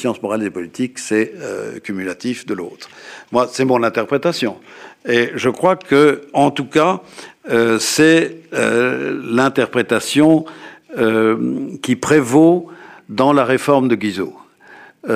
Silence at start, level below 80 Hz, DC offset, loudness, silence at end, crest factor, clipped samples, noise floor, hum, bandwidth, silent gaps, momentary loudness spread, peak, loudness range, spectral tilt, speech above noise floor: 0 s; -60 dBFS; under 0.1%; -16 LUFS; 0 s; 14 dB; under 0.1%; -43 dBFS; none; 15.5 kHz; none; 14 LU; -2 dBFS; 5 LU; -5 dB/octave; 27 dB